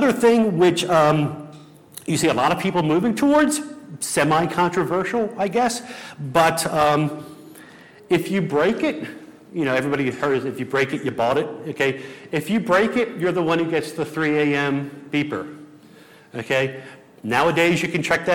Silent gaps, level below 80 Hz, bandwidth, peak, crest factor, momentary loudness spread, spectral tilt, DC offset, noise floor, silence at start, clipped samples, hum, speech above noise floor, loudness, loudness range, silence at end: none; -56 dBFS; 18.5 kHz; -4 dBFS; 16 dB; 16 LU; -5 dB/octave; under 0.1%; -47 dBFS; 0 s; under 0.1%; none; 27 dB; -21 LUFS; 4 LU; 0 s